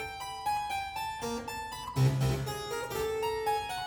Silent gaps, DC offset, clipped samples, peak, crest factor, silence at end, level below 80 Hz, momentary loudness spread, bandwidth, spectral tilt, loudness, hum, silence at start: none; under 0.1%; under 0.1%; -16 dBFS; 18 dB; 0 s; -50 dBFS; 8 LU; over 20 kHz; -5 dB/octave; -33 LUFS; none; 0 s